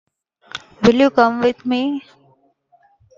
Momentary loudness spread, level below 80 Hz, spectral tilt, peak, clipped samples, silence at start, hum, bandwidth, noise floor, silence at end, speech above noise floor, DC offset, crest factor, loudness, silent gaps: 20 LU; -54 dBFS; -6 dB/octave; 0 dBFS; under 0.1%; 0.55 s; none; 7.6 kHz; -58 dBFS; 1.2 s; 42 dB; under 0.1%; 20 dB; -16 LUFS; none